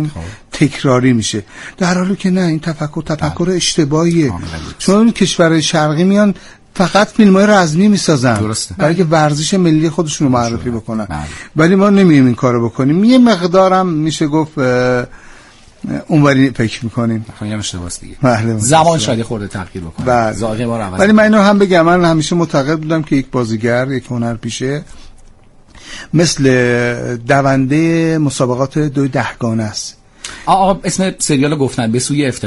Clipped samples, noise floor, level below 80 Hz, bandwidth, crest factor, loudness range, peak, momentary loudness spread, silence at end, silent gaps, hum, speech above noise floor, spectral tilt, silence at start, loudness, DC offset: under 0.1%; -41 dBFS; -38 dBFS; 11.5 kHz; 12 dB; 5 LU; 0 dBFS; 12 LU; 0 s; none; none; 29 dB; -5.5 dB/octave; 0 s; -13 LUFS; under 0.1%